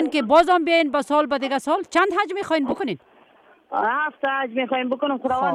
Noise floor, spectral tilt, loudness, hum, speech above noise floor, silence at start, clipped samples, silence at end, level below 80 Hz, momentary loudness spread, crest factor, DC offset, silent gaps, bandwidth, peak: -54 dBFS; -4 dB/octave; -21 LUFS; none; 33 dB; 0 s; under 0.1%; 0 s; -60 dBFS; 8 LU; 18 dB; under 0.1%; none; 13.5 kHz; -4 dBFS